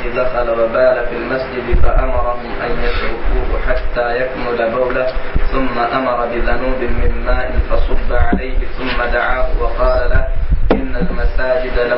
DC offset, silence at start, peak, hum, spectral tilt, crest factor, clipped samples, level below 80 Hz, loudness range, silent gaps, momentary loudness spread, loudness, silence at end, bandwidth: under 0.1%; 0 s; 0 dBFS; none; -11 dB/octave; 12 dB; under 0.1%; -18 dBFS; 1 LU; none; 5 LU; -18 LUFS; 0 s; 5.6 kHz